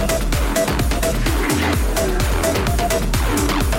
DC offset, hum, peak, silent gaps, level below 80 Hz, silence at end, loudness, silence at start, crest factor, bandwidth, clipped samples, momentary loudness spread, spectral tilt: under 0.1%; none; -8 dBFS; none; -22 dBFS; 0 s; -19 LUFS; 0 s; 10 dB; 17 kHz; under 0.1%; 1 LU; -4.5 dB/octave